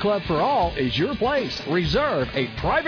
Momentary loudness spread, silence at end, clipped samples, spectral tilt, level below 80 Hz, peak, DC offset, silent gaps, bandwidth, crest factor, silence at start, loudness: 4 LU; 0 s; under 0.1%; -6.5 dB/octave; -38 dBFS; -10 dBFS; under 0.1%; none; 5.4 kHz; 12 dB; 0 s; -23 LUFS